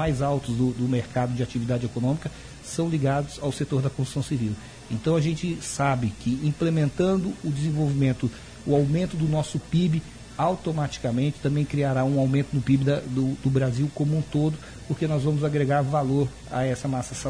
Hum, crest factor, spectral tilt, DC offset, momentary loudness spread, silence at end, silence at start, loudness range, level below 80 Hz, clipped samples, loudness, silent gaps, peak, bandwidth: none; 14 dB; -7 dB/octave; under 0.1%; 6 LU; 0 s; 0 s; 3 LU; -46 dBFS; under 0.1%; -25 LUFS; none; -10 dBFS; 10.5 kHz